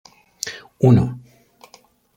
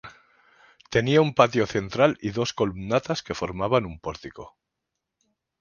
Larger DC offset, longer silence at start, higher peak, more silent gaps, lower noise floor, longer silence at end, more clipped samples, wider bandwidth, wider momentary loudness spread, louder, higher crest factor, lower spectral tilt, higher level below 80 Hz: neither; first, 0.45 s vs 0.05 s; about the same, -2 dBFS vs -2 dBFS; neither; second, -53 dBFS vs -83 dBFS; about the same, 1 s vs 1.1 s; neither; first, 15 kHz vs 7.2 kHz; about the same, 15 LU vs 15 LU; first, -19 LUFS vs -24 LUFS; about the same, 20 dB vs 24 dB; first, -7 dB/octave vs -5.5 dB/octave; about the same, -50 dBFS vs -52 dBFS